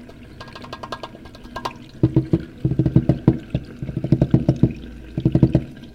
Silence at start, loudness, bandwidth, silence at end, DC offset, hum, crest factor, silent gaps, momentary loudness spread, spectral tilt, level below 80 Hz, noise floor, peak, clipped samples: 0 s; -21 LUFS; 6.8 kHz; 0 s; under 0.1%; none; 20 dB; none; 19 LU; -9.5 dB/octave; -36 dBFS; -39 dBFS; 0 dBFS; under 0.1%